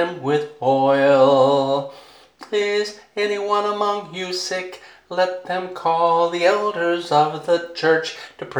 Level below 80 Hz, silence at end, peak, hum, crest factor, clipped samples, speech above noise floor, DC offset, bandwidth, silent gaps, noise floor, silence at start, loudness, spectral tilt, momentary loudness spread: -70 dBFS; 0 s; -4 dBFS; none; 16 dB; under 0.1%; 25 dB; under 0.1%; 11.5 kHz; none; -44 dBFS; 0 s; -19 LUFS; -4.5 dB/octave; 11 LU